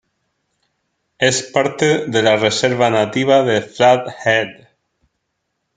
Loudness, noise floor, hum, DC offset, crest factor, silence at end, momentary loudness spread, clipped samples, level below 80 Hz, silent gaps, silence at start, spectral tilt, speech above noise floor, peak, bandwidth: -15 LUFS; -73 dBFS; none; under 0.1%; 18 dB; 1.25 s; 4 LU; under 0.1%; -60 dBFS; none; 1.2 s; -4 dB/octave; 58 dB; 0 dBFS; 9.6 kHz